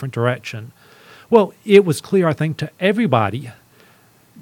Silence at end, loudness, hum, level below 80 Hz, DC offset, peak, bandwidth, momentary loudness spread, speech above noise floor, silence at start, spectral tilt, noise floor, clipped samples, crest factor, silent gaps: 0.9 s; -17 LUFS; none; -62 dBFS; under 0.1%; 0 dBFS; 16.5 kHz; 18 LU; 35 dB; 0 s; -6.5 dB/octave; -52 dBFS; under 0.1%; 18 dB; none